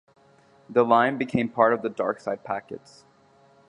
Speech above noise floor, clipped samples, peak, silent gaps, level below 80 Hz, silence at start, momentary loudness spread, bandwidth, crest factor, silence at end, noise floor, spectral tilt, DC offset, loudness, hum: 34 dB; under 0.1%; -4 dBFS; none; -64 dBFS; 0.7 s; 13 LU; 10 kHz; 22 dB; 0.9 s; -58 dBFS; -7 dB/octave; under 0.1%; -24 LUFS; none